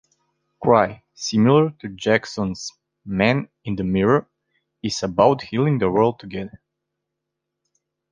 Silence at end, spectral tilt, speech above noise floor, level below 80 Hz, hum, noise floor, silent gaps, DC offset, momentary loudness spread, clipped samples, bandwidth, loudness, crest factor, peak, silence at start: 1.55 s; -6 dB/octave; 62 dB; -52 dBFS; none; -81 dBFS; none; under 0.1%; 14 LU; under 0.1%; 9.8 kHz; -20 LUFS; 20 dB; -2 dBFS; 0.6 s